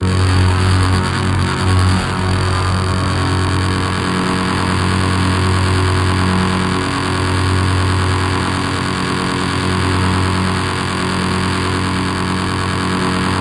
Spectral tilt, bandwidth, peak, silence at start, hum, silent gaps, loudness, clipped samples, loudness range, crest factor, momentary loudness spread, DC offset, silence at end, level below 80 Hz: -5.5 dB/octave; 11.5 kHz; -2 dBFS; 0 s; none; none; -16 LUFS; under 0.1%; 1 LU; 12 dB; 4 LU; under 0.1%; 0 s; -36 dBFS